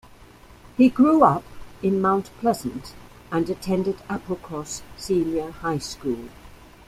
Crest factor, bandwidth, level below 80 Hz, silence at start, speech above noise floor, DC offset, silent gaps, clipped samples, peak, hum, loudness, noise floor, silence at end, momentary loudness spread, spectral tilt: 20 dB; 15 kHz; -50 dBFS; 0.2 s; 26 dB; under 0.1%; none; under 0.1%; -2 dBFS; none; -23 LUFS; -48 dBFS; 0.3 s; 16 LU; -6 dB/octave